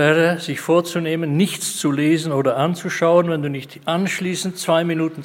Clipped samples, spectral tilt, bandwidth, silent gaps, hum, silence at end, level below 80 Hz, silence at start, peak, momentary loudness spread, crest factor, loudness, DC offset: under 0.1%; -5 dB/octave; 16.5 kHz; none; none; 0 s; -68 dBFS; 0 s; 0 dBFS; 7 LU; 18 dB; -19 LUFS; under 0.1%